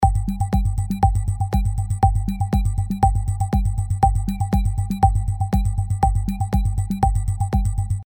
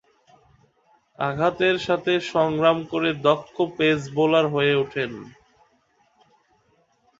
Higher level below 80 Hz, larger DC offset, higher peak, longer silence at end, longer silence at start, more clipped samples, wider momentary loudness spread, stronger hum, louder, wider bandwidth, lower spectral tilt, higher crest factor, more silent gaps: first, -24 dBFS vs -60 dBFS; neither; about the same, -2 dBFS vs -4 dBFS; second, 0.05 s vs 1.9 s; second, 0 s vs 1.2 s; neither; second, 4 LU vs 8 LU; neither; about the same, -22 LUFS vs -22 LUFS; first, 18.5 kHz vs 7.8 kHz; first, -7.5 dB/octave vs -6 dB/octave; about the same, 18 dB vs 20 dB; neither